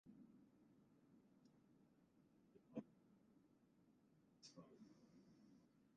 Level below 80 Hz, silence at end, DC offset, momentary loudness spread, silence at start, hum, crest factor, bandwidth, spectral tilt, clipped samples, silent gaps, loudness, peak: under -90 dBFS; 0 s; under 0.1%; 11 LU; 0.05 s; none; 28 dB; 7 kHz; -6 dB/octave; under 0.1%; none; -62 LUFS; -38 dBFS